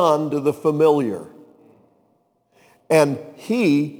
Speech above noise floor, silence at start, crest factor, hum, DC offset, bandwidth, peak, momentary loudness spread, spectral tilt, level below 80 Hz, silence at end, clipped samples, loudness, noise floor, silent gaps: 45 dB; 0 s; 18 dB; none; under 0.1%; over 20 kHz; -2 dBFS; 10 LU; -6.5 dB/octave; -70 dBFS; 0.05 s; under 0.1%; -19 LUFS; -64 dBFS; none